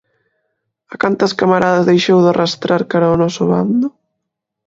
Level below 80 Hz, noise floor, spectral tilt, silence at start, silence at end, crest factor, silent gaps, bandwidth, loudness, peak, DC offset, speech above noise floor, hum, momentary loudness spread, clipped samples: -50 dBFS; -77 dBFS; -6 dB/octave; 0.9 s; 0.8 s; 14 dB; none; 7.8 kHz; -14 LUFS; 0 dBFS; under 0.1%; 64 dB; none; 7 LU; under 0.1%